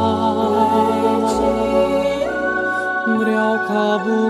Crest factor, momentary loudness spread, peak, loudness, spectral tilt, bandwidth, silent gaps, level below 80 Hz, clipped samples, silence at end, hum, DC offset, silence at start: 12 dB; 4 LU; -4 dBFS; -17 LUFS; -5.5 dB/octave; 13.5 kHz; none; -44 dBFS; under 0.1%; 0 s; none; under 0.1%; 0 s